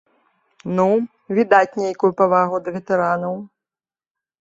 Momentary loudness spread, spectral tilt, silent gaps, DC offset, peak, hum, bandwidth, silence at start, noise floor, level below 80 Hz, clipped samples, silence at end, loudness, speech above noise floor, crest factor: 10 LU; -7.5 dB/octave; none; under 0.1%; -2 dBFS; none; 7.8 kHz; 0.65 s; under -90 dBFS; -64 dBFS; under 0.1%; 0.95 s; -19 LUFS; over 72 dB; 18 dB